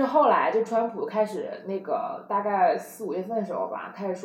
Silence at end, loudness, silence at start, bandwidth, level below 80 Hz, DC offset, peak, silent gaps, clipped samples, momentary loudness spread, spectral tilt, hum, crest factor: 0 s; -26 LUFS; 0 s; 16 kHz; -88 dBFS; under 0.1%; -10 dBFS; none; under 0.1%; 12 LU; -6 dB/octave; none; 16 dB